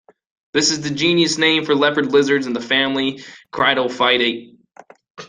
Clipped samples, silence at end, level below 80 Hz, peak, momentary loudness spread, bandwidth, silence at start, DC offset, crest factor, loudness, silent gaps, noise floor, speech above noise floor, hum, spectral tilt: under 0.1%; 0.05 s; -60 dBFS; -2 dBFS; 8 LU; 9.8 kHz; 0.55 s; under 0.1%; 18 dB; -17 LUFS; 5.10-5.15 s; -46 dBFS; 29 dB; none; -3 dB/octave